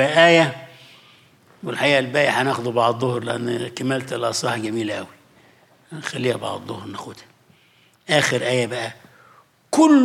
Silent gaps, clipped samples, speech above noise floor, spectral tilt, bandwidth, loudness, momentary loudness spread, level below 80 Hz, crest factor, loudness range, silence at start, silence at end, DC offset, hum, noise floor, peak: none; under 0.1%; 37 dB; -4.5 dB/octave; 15.5 kHz; -20 LUFS; 18 LU; -70 dBFS; 18 dB; 7 LU; 0 s; 0 s; under 0.1%; none; -57 dBFS; -2 dBFS